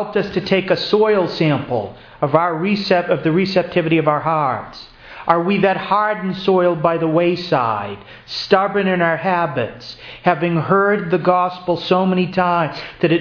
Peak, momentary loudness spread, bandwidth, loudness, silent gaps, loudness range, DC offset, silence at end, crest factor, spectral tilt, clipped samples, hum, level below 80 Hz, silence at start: 0 dBFS; 9 LU; 5.4 kHz; -17 LUFS; none; 1 LU; under 0.1%; 0 s; 18 dB; -7.5 dB/octave; under 0.1%; none; -52 dBFS; 0 s